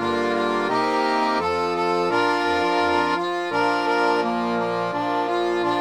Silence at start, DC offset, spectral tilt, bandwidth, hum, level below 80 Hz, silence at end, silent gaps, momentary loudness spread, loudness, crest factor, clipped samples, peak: 0 s; 0.1%; -5 dB/octave; 18 kHz; none; -60 dBFS; 0 s; none; 3 LU; -22 LUFS; 12 dB; under 0.1%; -8 dBFS